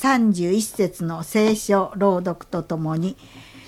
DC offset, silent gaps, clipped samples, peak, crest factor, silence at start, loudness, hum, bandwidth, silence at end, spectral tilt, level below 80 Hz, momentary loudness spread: under 0.1%; none; under 0.1%; -6 dBFS; 16 dB; 0 s; -22 LUFS; none; 16 kHz; 0.05 s; -5.5 dB/octave; -54 dBFS; 10 LU